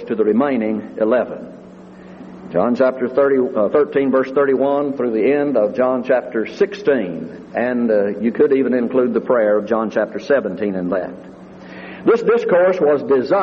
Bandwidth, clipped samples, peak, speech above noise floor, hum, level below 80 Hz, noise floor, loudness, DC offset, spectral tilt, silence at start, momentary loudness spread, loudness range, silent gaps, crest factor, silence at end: 6.8 kHz; under 0.1%; -4 dBFS; 22 dB; none; -60 dBFS; -38 dBFS; -17 LUFS; under 0.1%; -8 dB/octave; 0 s; 11 LU; 3 LU; none; 14 dB; 0 s